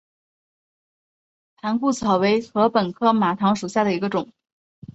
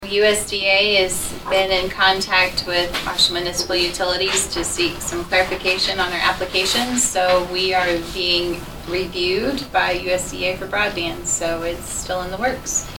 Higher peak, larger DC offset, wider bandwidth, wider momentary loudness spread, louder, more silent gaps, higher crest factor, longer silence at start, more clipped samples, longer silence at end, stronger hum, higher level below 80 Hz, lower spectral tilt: about the same, -4 dBFS vs -2 dBFS; neither; second, 8.2 kHz vs 19 kHz; about the same, 7 LU vs 8 LU; about the same, -21 LUFS vs -19 LUFS; first, 4.52-4.82 s vs none; about the same, 18 dB vs 18 dB; first, 1.65 s vs 0 s; neither; about the same, 0.05 s vs 0 s; neither; second, -62 dBFS vs -40 dBFS; first, -6 dB/octave vs -2 dB/octave